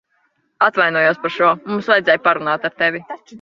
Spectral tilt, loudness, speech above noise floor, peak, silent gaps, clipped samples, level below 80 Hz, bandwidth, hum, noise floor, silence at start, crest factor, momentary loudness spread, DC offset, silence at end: -6 dB/octave; -16 LUFS; 47 dB; -2 dBFS; none; under 0.1%; -66 dBFS; 7.2 kHz; none; -64 dBFS; 0.6 s; 16 dB; 7 LU; under 0.1%; 0.05 s